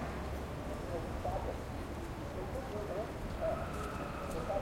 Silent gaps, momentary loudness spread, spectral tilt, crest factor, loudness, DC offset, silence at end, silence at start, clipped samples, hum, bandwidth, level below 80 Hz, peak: none; 5 LU; -6.5 dB/octave; 14 dB; -40 LUFS; under 0.1%; 0 s; 0 s; under 0.1%; none; 16.5 kHz; -46 dBFS; -24 dBFS